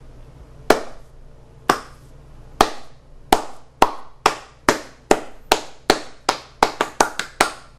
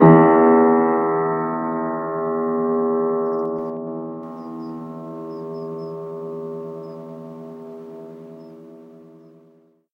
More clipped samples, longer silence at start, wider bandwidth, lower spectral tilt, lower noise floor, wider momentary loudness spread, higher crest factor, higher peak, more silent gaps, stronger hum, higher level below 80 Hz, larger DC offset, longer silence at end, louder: neither; about the same, 0 s vs 0 s; first, 16.5 kHz vs 5.4 kHz; second, -2.5 dB/octave vs -11.5 dB/octave; second, -43 dBFS vs -55 dBFS; second, 5 LU vs 23 LU; about the same, 22 dB vs 20 dB; about the same, 0 dBFS vs 0 dBFS; neither; neither; first, -42 dBFS vs -70 dBFS; neither; second, 0.15 s vs 0.9 s; about the same, -21 LUFS vs -20 LUFS